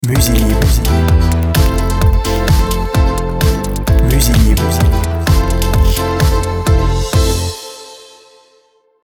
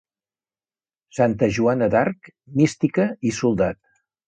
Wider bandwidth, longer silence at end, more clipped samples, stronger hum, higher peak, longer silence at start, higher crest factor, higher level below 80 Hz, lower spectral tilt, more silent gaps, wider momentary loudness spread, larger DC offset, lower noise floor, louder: first, 20 kHz vs 9.4 kHz; first, 1.15 s vs 0.55 s; neither; neither; first, 0 dBFS vs -4 dBFS; second, 0 s vs 1.15 s; second, 12 dB vs 18 dB; first, -14 dBFS vs -52 dBFS; about the same, -5.5 dB/octave vs -6.5 dB/octave; neither; second, 4 LU vs 9 LU; neither; second, -53 dBFS vs under -90 dBFS; first, -13 LUFS vs -21 LUFS